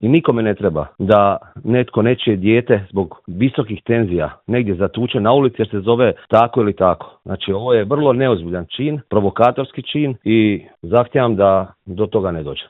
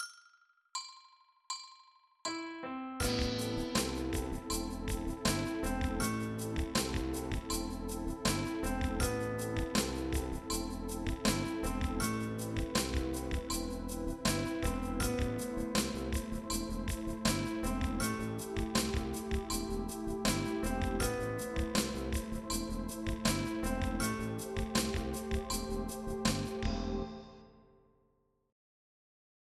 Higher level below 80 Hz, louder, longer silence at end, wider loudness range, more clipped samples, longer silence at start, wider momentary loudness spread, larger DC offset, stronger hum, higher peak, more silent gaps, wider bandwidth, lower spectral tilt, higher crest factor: second, -50 dBFS vs -44 dBFS; first, -17 LUFS vs -36 LUFS; second, 0.05 s vs 1.9 s; about the same, 2 LU vs 2 LU; neither; about the same, 0 s vs 0 s; about the same, 8 LU vs 6 LU; neither; neither; first, 0 dBFS vs -16 dBFS; neither; second, 4.1 kHz vs 15 kHz; first, -9.5 dB/octave vs -4.5 dB/octave; about the same, 16 dB vs 20 dB